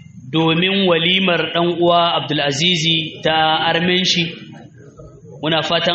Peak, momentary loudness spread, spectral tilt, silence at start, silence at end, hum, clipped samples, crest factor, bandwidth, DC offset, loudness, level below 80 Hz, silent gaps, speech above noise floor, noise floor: -2 dBFS; 5 LU; -2.5 dB/octave; 0.15 s; 0 s; none; under 0.1%; 16 dB; 8 kHz; under 0.1%; -15 LUFS; -54 dBFS; none; 24 dB; -40 dBFS